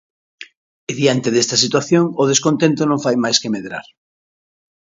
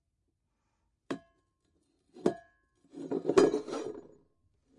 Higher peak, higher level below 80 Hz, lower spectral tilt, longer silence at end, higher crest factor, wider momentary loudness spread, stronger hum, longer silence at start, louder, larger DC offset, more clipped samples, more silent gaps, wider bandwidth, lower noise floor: first, 0 dBFS vs -12 dBFS; first, -62 dBFS vs -72 dBFS; second, -4 dB/octave vs -5.5 dB/octave; first, 1.05 s vs 0.8 s; about the same, 18 dB vs 22 dB; second, 13 LU vs 22 LU; neither; second, 0.4 s vs 1.1 s; first, -16 LUFS vs -32 LUFS; neither; neither; first, 0.57-0.87 s vs none; second, 7.8 kHz vs 11 kHz; first, under -90 dBFS vs -80 dBFS